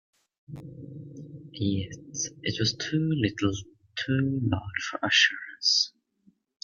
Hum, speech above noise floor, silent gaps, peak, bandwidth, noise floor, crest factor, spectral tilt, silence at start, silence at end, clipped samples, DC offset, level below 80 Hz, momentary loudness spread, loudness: none; 37 dB; none; -8 dBFS; 7.4 kHz; -65 dBFS; 22 dB; -3.5 dB/octave; 0.5 s; 0.75 s; under 0.1%; under 0.1%; -60 dBFS; 21 LU; -27 LUFS